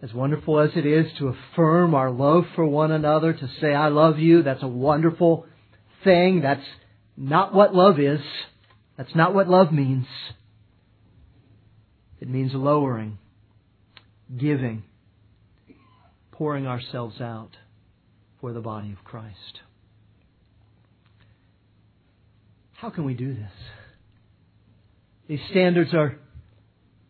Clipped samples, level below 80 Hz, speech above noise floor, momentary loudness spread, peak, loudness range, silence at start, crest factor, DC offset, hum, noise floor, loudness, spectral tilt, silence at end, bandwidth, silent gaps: under 0.1%; -60 dBFS; 39 dB; 22 LU; -2 dBFS; 17 LU; 0 s; 20 dB; under 0.1%; none; -60 dBFS; -21 LUFS; -11 dB/octave; 0.7 s; 4.6 kHz; none